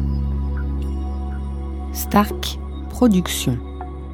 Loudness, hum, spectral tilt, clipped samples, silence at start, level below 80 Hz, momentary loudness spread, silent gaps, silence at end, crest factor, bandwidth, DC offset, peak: -22 LUFS; none; -5.5 dB/octave; under 0.1%; 0 s; -26 dBFS; 12 LU; none; 0 s; 20 dB; 18.5 kHz; under 0.1%; -2 dBFS